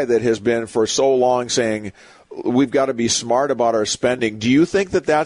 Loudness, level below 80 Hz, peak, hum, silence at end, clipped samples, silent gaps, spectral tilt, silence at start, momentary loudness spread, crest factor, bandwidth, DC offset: -18 LUFS; -52 dBFS; -6 dBFS; none; 0 s; under 0.1%; none; -4 dB/octave; 0 s; 6 LU; 12 dB; 11 kHz; under 0.1%